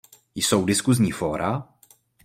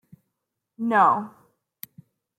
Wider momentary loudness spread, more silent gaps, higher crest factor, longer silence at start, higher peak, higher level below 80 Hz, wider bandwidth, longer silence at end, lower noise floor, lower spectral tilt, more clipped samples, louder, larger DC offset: second, 10 LU vs 24 LU; neither; about the same, 20 dB vs 20 dB; second, 0.35 s vs 0.8 s; about the same, -4 dBFS vs -6 dBFS; first, -54 dBFS vs -80 dBFS; about the same, 16.5 kHz vs 16.5 kHz; second, 0.6 s vs 1.1 s; second, -57 dBFS vs -82 dBFS; second, -4.5 dB/octave vs -6 dB/octave; neither; about the same, -23 LUFS vs -21 LUFS; neither